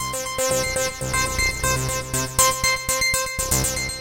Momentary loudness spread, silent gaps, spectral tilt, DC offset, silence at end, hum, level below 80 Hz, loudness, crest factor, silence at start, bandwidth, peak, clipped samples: 6 LU; none; -2 dB/octave; under 0.1%; 0 s; none; -34 dBFS; -21 LUFS; 20 dB; 0 s; 17 kHz; -2 dBFS; under 0.1%